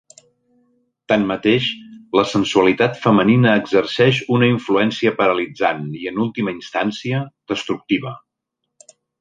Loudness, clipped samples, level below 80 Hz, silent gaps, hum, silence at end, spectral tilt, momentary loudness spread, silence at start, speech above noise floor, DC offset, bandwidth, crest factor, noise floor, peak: -18 LUFS; under 0.1%; -56 dBFS; none; none; 1.05 s; -6 dB/octave; 10 LU; 1.1 s; 61 dB; under 0.1%; 9.4 kHz; 16 dB; -78 dBFS; -2 dBFS